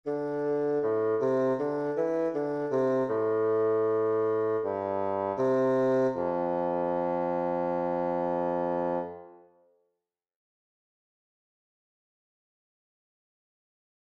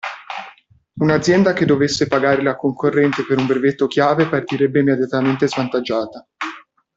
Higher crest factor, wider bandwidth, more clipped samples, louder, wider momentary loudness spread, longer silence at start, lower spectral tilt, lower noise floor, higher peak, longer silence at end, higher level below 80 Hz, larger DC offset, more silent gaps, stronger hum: about the same, 12 dB vs 16 dB; second, 6.6 kHz vs 8 kHz; neither; second, -28 LUFS vs -17 LUFS; second, 4 LU vs 14 LU; about the same, 0.05 s vs 0.05 s; first, -8.5 dB/octave vs -6 dB/octave; first, -84 dBFS vs -47 dBFS; second, -16 dBFS vs -2 dBFS; first, 4.8 s vs 0.4 s; second, -70 dBFS vs -54 dBFS; neither; neither; neither